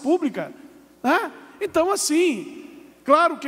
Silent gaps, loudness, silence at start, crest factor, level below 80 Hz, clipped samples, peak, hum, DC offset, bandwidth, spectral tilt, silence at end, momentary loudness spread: none; -22 LUFS; 0 s; 18 dB; -64 dBFS; under 0.1%; -4 dBFS; none; under 0.1%; 16 kHz; -3 dB/octave; 0 s; 17 LU